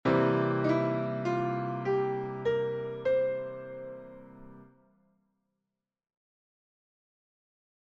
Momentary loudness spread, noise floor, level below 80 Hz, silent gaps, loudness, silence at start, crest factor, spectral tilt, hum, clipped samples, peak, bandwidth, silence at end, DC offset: 17 LU; -88 dBFS; -66 dBFS; none; -30 LUFS; 0.05 s; 18 dB; -8.5 dB/octave; none; under 0.1%; -14 dBFS; 7.4 kHz; 3.2 s; under 0.1%